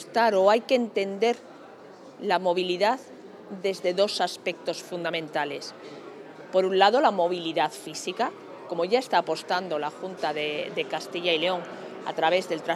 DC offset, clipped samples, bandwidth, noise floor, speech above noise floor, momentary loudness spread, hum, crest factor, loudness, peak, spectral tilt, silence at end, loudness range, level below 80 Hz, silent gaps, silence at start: under 0.1%; under 0.1%; 14 kHz; -47 dBFS; 21 dB; 18 LU; none; 22 dB; -26 LUFS; -4 dBFS; -4 dB/octave; 0 s; 4 LU; under -90 dBFS; none; 0 s